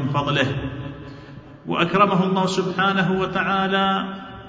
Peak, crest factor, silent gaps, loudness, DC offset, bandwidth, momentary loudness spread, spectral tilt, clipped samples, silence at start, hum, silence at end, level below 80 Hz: -4 dBFS; 18 dB; none; -21 LUFS; under 0.1%; 8 kHz; 20 LU; -6 dB/octave; under 0.1%; 0 s; none; 0 s; -48 dBFS